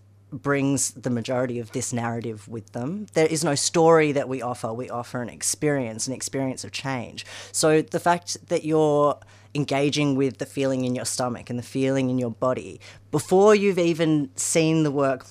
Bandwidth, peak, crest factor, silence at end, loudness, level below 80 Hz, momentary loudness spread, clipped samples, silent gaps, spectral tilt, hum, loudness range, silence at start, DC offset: 15.5 kHz; -6 dBFS; 18 dB; 0 s; -23 LUFS; -64 dBFS; 12 LU; under 0.1%; none; -4.5 dB/octave; none; 4 LU; 0.3 s; under 0.1%